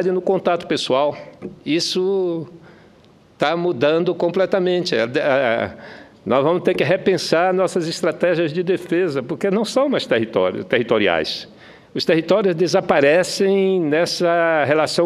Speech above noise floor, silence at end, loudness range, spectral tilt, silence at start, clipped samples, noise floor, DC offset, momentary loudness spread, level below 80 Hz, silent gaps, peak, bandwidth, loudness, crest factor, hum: 32 dB; 0 s; 4 LU; -5 dB/octave; 0 s; under 0.1%; -50 dBFS; under 0.1%; 7 LU; -60 dBFS; none; 0 dBFS; 13.5 kHz; -18 LUFS; 18 dB; none